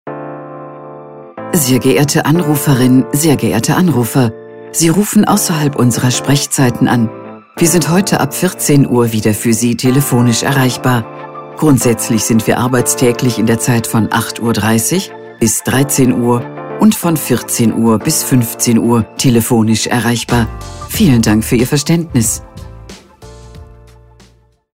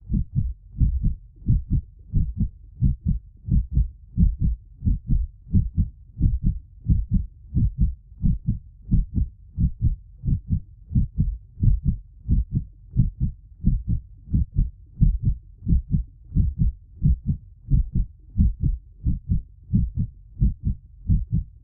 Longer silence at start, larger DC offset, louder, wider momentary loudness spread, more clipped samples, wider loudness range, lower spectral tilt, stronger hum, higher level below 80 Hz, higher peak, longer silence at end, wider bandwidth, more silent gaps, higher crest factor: about the same, 0.05 s vs 0.05 s; first, 0.7% vs under 0.1%; first, -12 LUFS vs -26 LUFS; first, 15 LU vs 7 LU; neither; about the same, 2 LU vs 1 LU; second, -5 dB/octave vs -18.5 dB/octave; neither; second, -38 dBFS vs -26 dBFS; first, 0 dBFS vs -6 dBFS; first, 1.05 s vs 0.15 s; first, 16.5 kHz vs 0.7 kHz; neither; second, 12 dB vs 18 dB